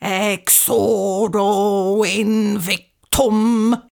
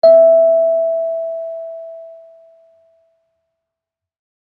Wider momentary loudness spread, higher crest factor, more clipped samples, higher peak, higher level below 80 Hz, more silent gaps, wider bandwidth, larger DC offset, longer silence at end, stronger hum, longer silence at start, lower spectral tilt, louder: second, 7 LU vs 23 LU; about the same, 16 dB vs 16 dB; neither; about the same, 0 dBFS vs -2 dBFS; first, -42 dBFS vs -74 dBFS; neither; first, over 20 kHz vs 4.5 kHz; neither; second, 0.2 s vs 2.3 s; neither; about the same, 0 s vs 0.05 s; second, -3.5 dB/octave vs -6.5 dB/octave; second, -16 LUFS vs -13 LUFS